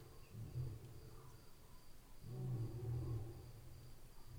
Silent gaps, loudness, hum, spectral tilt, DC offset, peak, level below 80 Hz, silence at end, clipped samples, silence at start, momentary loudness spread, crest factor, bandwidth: none; -50 LUFS; none; -7.5 dB/octave; under 0.1%; -34 dBFS; -58 dBFS; 0 s; under 0.1%; 0 s; 18 LU; 16 dB; over 20 kHz